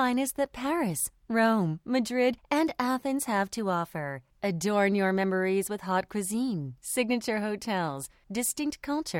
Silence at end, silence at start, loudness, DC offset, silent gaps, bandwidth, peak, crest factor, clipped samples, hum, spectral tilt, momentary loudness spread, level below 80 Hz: 0 s; 0 s; -29 LUFS; under 0.1%; none; 17.5 kHz; -12 dBFS; 18 dB; under 0.1%; none; -4.5 dB/octave; 7 LU; -62 dBFS